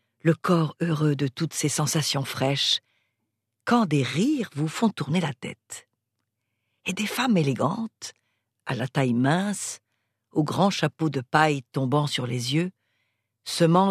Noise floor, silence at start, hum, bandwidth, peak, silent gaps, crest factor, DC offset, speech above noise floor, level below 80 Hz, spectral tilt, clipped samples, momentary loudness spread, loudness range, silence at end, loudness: -80 dBFS; 0.25 s; none; 14 kHz; -4 dBFS; none; 22 dB; under 0.1%; 56 dB; -70 dBFS; -5 dB/octave; under 0.1%; 13 LU; 4 LU; 0 s; -25 LUFS